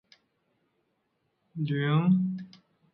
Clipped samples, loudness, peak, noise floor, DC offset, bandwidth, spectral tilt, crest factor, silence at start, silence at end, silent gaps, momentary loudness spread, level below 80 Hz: under 0.1%; -27 LUFS; -14 dBFS; -76 dBFS; under 0.1%; 5.4 kHz; -10 dB/octave; 16 dB; 1.55 s; 0.45 s; none; 20 LU; -76 dBFS